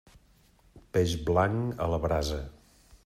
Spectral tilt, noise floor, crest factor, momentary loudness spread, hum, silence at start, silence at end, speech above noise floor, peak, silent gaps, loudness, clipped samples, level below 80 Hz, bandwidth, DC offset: -6 dB/octave; -62 dBFS; 18 dB; 9 LU; none; 0.75 s; 0.55 s; 34 dB; -12 dBFS; none; -29 LUFS; under 0.1%; -44 dBFS; 15 kHz; under 0.1%